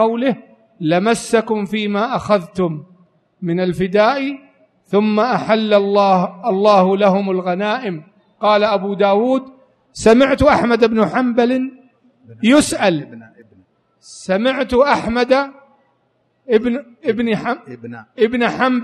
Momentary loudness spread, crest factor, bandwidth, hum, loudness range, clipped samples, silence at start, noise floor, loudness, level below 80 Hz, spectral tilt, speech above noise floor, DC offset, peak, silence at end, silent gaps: 12 LU; 16 dB; 12.5 kHz; none; 4 LU; under 0.1%; 0 s; -63 dBFS; -16 LUFS; -46 dBFS; -5.5 dB/octave; 47 dB; under 0.1%; 0 dBFS; 0 s; none